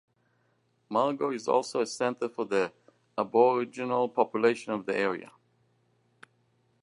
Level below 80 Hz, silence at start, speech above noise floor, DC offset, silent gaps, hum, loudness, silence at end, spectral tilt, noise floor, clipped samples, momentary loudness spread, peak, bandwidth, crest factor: -80 dBFS; 0.9 s; 43 dB; under 0.1%; none; none; -28 LUFS; 1.6 s; -5 dB/octave; -71 dBFS; under 0.1%; 9 LU; -10 dBFS; 11 kHz; 20 dB